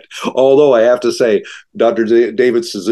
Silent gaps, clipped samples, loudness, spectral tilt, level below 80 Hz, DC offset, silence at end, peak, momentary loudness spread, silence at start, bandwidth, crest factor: none; under 0.1%; -12 LUFS; -5 dB/octave; -64 dBFS; under 0.1%; 0 s; 0 dBFS; 9 LU; 0.1 s; 12.5 kHz; 12 dB